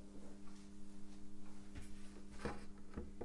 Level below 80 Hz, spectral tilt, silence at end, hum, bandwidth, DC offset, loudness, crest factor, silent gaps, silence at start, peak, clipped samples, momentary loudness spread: -56 dBFS; -5.5 dB/octave; 0 s; none; 11.5 kHz; under 0.1%; -55 LUFS; 18 dB; none; 0 s; -28 dBFS; under 0.1%; 9 LU